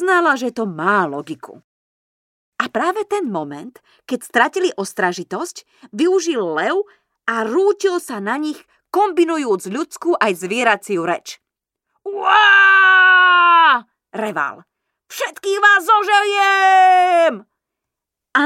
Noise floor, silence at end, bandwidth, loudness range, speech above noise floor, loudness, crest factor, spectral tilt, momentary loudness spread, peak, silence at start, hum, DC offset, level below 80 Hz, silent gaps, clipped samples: -82 dBFS; 0 s; 16 kHz; 10 LU; 66 dB; -15 LUFS; 16 dB; -3 dB/octave; 18 LU; 0 dBFS; 0 s; none; under 0.1%; -76 dBFS; 1.64-2.52 s; under 0.1%